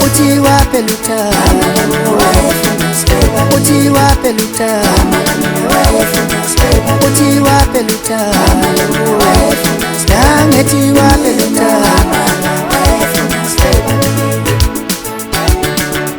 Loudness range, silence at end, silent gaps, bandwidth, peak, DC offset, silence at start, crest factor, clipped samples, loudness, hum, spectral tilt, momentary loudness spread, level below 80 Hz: 2 LU; 0 s; none; over 20 kHz; 0 dBFS; under 0.1%; 0 s; 10 dB; 0.5%; -10 LUFS; none; -4.5 dB/octave; 5 LU; -20 dBFS